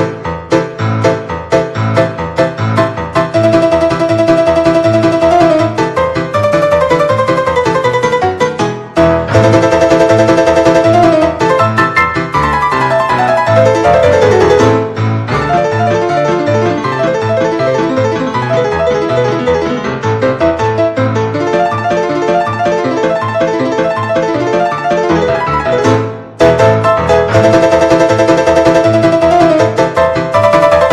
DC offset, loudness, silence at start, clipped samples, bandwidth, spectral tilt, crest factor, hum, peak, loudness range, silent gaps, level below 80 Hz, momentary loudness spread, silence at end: under 0.1%; -10 LUFS; 0 s; 0.9%; 12.5 kHz; -6.5 dB/octave; 10 dB; none; 0 dBFS; 4 LU; none; -38 dBFS; 6 LU; 0 s